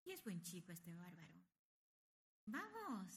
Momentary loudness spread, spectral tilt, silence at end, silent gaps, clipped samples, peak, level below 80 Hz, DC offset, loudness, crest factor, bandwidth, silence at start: 12 LU; -4.5 dB/octave; 0 s; 1.59-2.47 s; under 0.1%; -38 dBFS; under -90 dBFS; under 0.1%; -53 LUFS; 16 dB; 15.5 kHz; 0.05 s